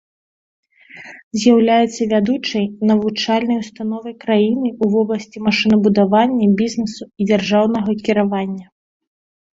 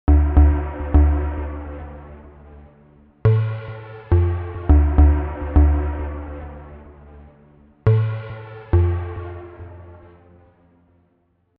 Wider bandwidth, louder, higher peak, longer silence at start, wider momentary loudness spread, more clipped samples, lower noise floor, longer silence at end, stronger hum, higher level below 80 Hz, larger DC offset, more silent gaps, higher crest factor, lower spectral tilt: first, 7.8 kHz vs 3.4 kHz; about the same, -17 LUFS vs -19 LUFS; about the same, -2 dBFS vs -2 dBFS; first, 0.95 s vs 0.1 s; second, 11 LU vs 22 LU; neither; second, -40 dBFS vs -64 dBFS; second, 0.9 s vs 1.65 s; neither; second, -56 dBFS vs -22 dBFS; neither; first, 1.24-1.31 s vs none; about the same, 16 dB vs 18 dB; second, -6 dB/octave vs -9.5 dB/octave